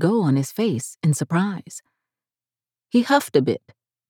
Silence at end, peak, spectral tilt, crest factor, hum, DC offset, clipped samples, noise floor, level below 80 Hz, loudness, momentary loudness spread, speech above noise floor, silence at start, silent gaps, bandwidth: 0.5 s; -4 dBFS; -6 dB/octave; 18 dB; none; under 0.1%; under 0.1%; under -90 dBFS; -78 dBFS; -21 LUFS; 13 LU; over 69 dB; 0 s; none; 18.5 kHz